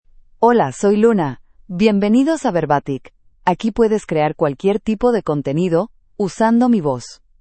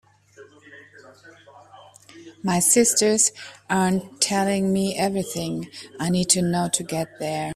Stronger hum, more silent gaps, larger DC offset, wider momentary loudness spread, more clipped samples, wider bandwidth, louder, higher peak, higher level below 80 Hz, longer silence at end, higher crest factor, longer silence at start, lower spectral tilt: neither; neither; neither; about the same, 11 LU vs 13 LU; neither; second, 8.8 kHz vs 16 kHz; first, -17 LUFS vs -21 LUFS; first, 0 dBFS vs -4 dBFS; first, -46 dBFS vs -58 dBFS; first, 0.25 s vs 0 s; about the same, 16 dB vs 20 dB; about the same, 0.4 s vs 0.4 s; first, -7 dB/octave vs -3.5 dB/octave